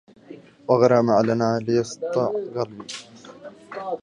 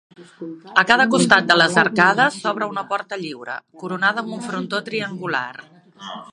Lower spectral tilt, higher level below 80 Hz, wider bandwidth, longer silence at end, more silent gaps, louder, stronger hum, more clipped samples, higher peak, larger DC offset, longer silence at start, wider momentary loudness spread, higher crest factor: first, -6.5 dB/octave vs -3.5 dB/octave; about the same, -64 dBFS vs -64 dBFS; about the same, 11 kHz vs 11.5 kHz; about the same, 0.05 s vs 0.05 s; neither; second, -21 LUFS vs -18 LUFS; neither; neither; second, -4 dBFS vs 0 dBFS; neither; about the same, 0.3 s vs 0.2 s; about the same, 20 LU vs 19 LU; about the same, 20 dB vs 20 dB